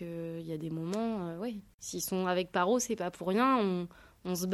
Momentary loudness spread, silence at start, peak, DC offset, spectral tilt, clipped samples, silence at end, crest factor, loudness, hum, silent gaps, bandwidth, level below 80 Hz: 13 LU; 0 s; -16 dBFS; under 0.1%; -5 dB/octave; under 0.1%; 0 s; 16 dB; -33 LUFS; none; 1.74-1.78 s; 16 kHz; -66 dBFS